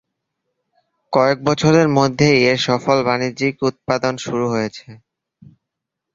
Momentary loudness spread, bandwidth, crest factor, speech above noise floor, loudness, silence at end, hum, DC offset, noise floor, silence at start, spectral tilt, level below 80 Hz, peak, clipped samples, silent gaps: 8 LU; 7.8 kHz; 18 dB; 64 dB; -17 LUFS; 1.2 s; none; under 0.1%; -81 dBFS; 1.1 s; -5.5 dB/octave; -54 dBFS; 0 dBFS; under 0.1%; none